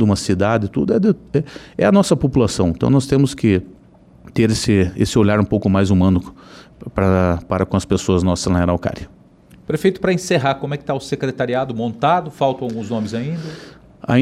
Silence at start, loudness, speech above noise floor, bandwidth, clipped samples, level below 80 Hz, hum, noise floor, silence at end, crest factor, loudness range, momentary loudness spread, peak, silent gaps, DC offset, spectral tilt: 0 s; -18 LUFS; 29 dB; 13 kHz; under 0.1%; -40 dBFS; none; -46 dBFS; 0 s; 14 dB; 4 LU; 10 LU; -4 dBFS; none; under 0.1%; -6.5 dB/octave